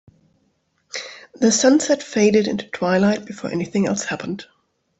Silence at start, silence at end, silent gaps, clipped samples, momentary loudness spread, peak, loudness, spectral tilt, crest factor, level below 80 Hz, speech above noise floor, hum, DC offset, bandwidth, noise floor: 0.95 s; 0.55 s; none; under 0.1%; 16 LU; -4 dBFS; -19 LUFS; -4.5 dB/octave; 16 dB; -60 dBFS; 48 dB; none; under 0.1%; 8.2 kHz; -66 dBFS